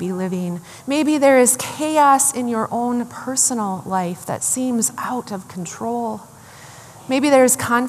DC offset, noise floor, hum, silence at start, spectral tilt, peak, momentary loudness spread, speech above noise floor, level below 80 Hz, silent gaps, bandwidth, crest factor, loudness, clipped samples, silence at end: under 0.1%; -41 dBFS; none; 0 s; -3.5 dB/octave; 0 dBFS; 14 LU; 22 dB; -64 dBFS; none; 14.5 kHz; 20 dB; -18 LUFS; under 0.1%; 0 s